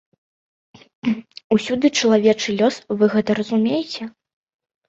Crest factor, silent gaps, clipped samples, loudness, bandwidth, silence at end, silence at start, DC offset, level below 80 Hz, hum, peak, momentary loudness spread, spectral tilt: 18 dB; 1.44-1.50 s; under 0.1%; -19 LUFS; 7.8 kHz; 0.8 s; 1.05 s; under 0.1%; -62 dBFS; none; -4 dBFS; 12 LU; -5 dB/octave